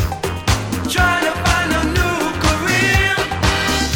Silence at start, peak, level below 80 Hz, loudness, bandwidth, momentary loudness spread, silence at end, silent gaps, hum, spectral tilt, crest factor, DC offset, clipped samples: 0 s; -2 dBFS; -26 dBFS; -16 LUFS; 19.5 kHz; 5 LU; 0 s; none; none; -4 dB/octave; 16 dB; under 0.1%; under 0.1%